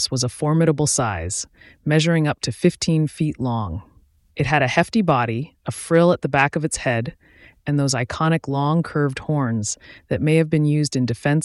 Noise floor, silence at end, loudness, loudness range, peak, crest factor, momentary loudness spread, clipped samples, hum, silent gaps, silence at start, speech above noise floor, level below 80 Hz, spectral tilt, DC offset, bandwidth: -51 dBFS; 0 s; -20 LUFS; 2 LU; -2 dBFS; 18 dB; 10 LU; under 0.1%; none; none; 0 s; 32 dB; -48 dBFS; -5 dB/octave; under 0.1%; 12 kHz